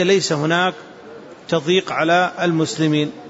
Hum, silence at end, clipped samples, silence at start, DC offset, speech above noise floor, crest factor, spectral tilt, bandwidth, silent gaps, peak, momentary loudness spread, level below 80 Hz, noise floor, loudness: none; 0 s; under 0.1%; 0 s; under 0.1%; 20 dB; 14 dB; -4.5 dB/octave; 8 kHz; none; -4 dBFS; 21 LU; -64 dBFS; -38 dBFS; -18 LUFS